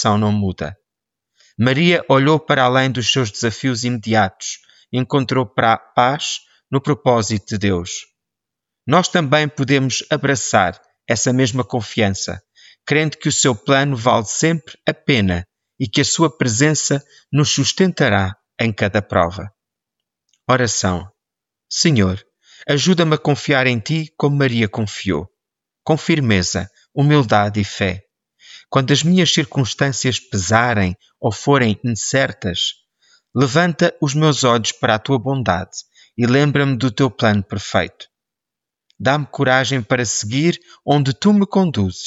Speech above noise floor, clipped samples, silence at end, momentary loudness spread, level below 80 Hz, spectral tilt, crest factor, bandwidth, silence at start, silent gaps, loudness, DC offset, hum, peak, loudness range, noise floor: 68 dB; under 0.1%; 0 s; 9 LU; -50 dBFS; -4.5 dB/octave; 16 dB; 8 kHz; 0 s; none; -17 LUFS; under 0.1%; none; -2 dBFS; 2 LU; -85 dBFS